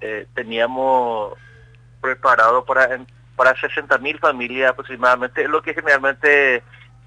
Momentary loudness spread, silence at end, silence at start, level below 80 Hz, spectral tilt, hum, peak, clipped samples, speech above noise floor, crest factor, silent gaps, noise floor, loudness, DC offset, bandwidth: 12 LU; 0.45 s; 0 s; -56 dBFS; -4.5 dB/octave; none; -4 dBFS; under 0.1%; 28 dB; 16 dB; none; -46 dBFS; -17 LUFS; under 0.1%; 10.5 kHz